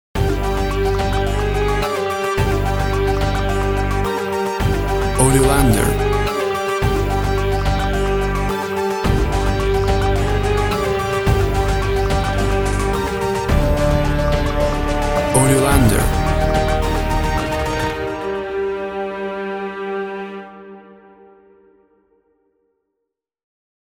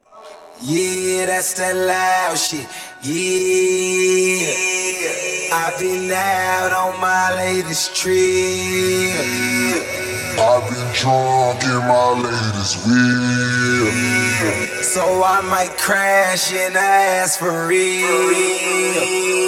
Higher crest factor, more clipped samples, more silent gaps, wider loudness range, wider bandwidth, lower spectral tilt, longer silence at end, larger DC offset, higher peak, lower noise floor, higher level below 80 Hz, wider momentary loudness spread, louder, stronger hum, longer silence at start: about the same, 18 dB vs 16 dB; neither; neither; first, 9 LU vs 2 LU; first, over 20 kHz vs 17 kHz; first, -5.5 dB/octave vs -3 dB/octave; first, 3.05 s vs 0 s; neither; about the same, 0 dBFS vs -2 dBFS; first, -78 dBFS vs -40 dBFS; first, -24 dBFS vs -54 dBFS; first, 9 LU vs 5 LU; about the same, -18 LUFS vs -17 LUFS; neither; about the same, 0.15 s vs 0.15 s